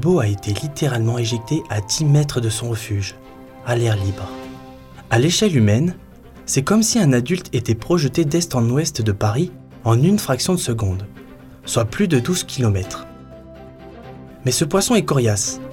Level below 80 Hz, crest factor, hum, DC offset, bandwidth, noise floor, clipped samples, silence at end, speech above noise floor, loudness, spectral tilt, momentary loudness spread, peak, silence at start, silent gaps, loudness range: -46 dBFS; 16 dB; none; under 0.1%; 17 kHz; -40 dBFS; under 0.1%; 0 s; 22 dB; -19 LUFS; -5 dB/octave; 18 LU; -4 dBFS; 0 s; none; 4 LU